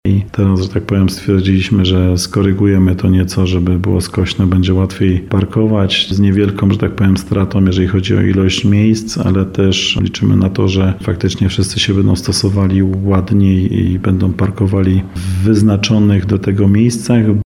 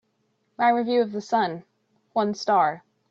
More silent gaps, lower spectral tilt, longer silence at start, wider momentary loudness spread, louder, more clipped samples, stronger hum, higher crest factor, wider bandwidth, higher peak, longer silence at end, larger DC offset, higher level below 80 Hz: neither; first, -6.5 dB/octave vs -5 dB/octave; second, 0.05 s vs 0.6 s; second, 4 LU vs 8 LU; first, -13 LUFS vs -24 LUFS; neither; neither; about the same, 12 dB vs 16 dB; first, 12.5 kHz vs 7.8 kHz; first, 0 dBFS vs -8 dBFS; second, 0 s vs 0.3 s; neither; first, -34 dBFS vs -74 dBFS